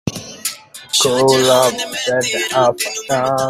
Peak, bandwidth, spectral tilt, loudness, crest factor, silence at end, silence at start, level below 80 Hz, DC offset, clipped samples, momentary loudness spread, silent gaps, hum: 0 dBFS; 16 kHz; -2.5 dB/octave; -15 LUFS; 16 dB; 0 s; 0.05 s; -54 dBFS; under 0.1%; under 0.1%; 12 LU; none; none